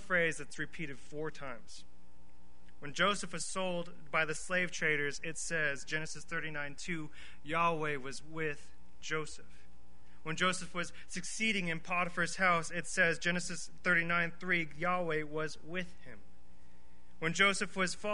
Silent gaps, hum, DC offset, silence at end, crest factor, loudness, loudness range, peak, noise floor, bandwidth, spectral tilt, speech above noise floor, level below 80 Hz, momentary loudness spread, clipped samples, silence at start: none; none; 1%; 0 s; 22 dB; -35 LUFS; 6 LU; -14 dBFS; -63 dBFS; 10.5 kHz; -3.5 dB/octave; 27 dB; -62 dBFS; 14 LU; under 0.1%; 0 s